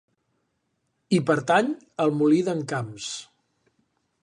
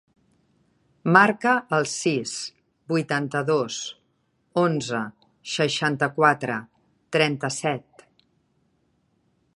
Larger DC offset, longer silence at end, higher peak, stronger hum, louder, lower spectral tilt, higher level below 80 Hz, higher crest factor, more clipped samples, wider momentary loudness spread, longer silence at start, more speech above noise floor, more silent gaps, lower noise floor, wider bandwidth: neither; second, 1 s vs 1.75 s; second, -6 dBFS vs -2 dBFS; neither; about the same, -24 LUFS vs -23 LUFS; about the same, -5.5 dB/octave vs -4.5 dB/octave; about the same, -72 dBFS vs -70 dBFS; about the same, 20 dB vs 24 dB; neither; about the same, 12 LU vs 13 LU; about the same, 1.1 s vs 1.05 s; first, 52 dB vs 46 dB; neither; first, -75 dBFS vs -69 dBFS; about the same, 10.5 kHz vs 11.5 kHz